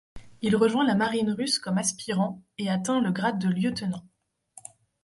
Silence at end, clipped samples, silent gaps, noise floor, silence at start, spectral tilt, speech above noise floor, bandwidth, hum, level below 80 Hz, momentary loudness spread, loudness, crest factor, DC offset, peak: 1 s; under 0.1%; none; -55 dBFS; 0.15 s; -4.5 dB/octave; 29 dB; 11.5 kHz; none; -60 dBFS; 11 LU; -26 LUFS; 16 dB; under 0.1%; -10 dBFS